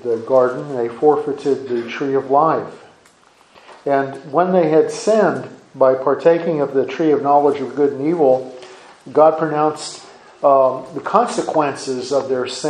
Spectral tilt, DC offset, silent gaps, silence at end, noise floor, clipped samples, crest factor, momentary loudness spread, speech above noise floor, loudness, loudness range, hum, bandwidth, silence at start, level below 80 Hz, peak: -5.5 dB/octave; under 0.1%; none; 0 s; -51 dBFS; under 0.1%; 18 dB; 10 LU; 35 dB; -17 LUFS; 3 LU; none; 10.5 kHz; 0.05 s; -68 dBFS; 0 dBFS